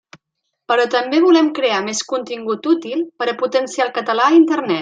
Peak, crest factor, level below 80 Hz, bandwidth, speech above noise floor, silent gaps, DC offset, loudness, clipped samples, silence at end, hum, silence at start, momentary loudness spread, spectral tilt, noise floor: -2 dBFS; 14 dB; -72 dBFS; 9.2 kHz; 60 dB; none; under 0.1%; -17 LUFS; under 0.1%; 0 s; none; 0.7 s; 10 LU; -3.5 dB/octave; -76 dBFS